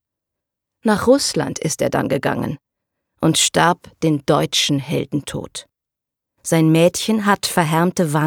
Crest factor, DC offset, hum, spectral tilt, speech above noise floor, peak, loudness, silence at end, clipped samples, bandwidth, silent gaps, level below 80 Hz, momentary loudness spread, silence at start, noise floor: 16 dB; under 0.1%; none; -4.5 dB/octave; 67 dB; -2 dBFS; -18 LUFS; 0 s; under 0.1%; 18 kHz; none; -52 dBFS; 12 LU; 0.85 s; -85 dBFS